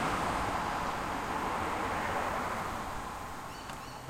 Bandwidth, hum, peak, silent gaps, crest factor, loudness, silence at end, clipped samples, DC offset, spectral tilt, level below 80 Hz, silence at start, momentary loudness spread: 16.5 kHz; none; -18 dBFS; none; 16 dB; -35 LUFS; 0 s; under 0.1%; under 0.1%; -4 dB/octave; -50 dBFS; 0 s; 10 LU